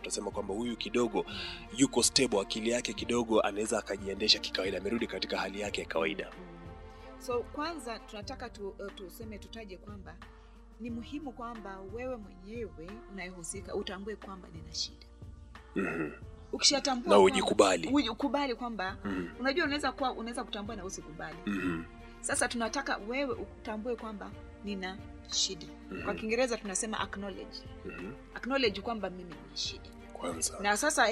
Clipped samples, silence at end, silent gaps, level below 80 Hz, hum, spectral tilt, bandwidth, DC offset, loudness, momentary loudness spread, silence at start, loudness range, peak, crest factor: under 0.1%; 0 s; none; -54 dBFS; none; -3 dB/octave; 15 kHz; under 0.1%; -32 LUFS; 19 LU; 0 s; 14 LU; -10 dBFS; 24 dB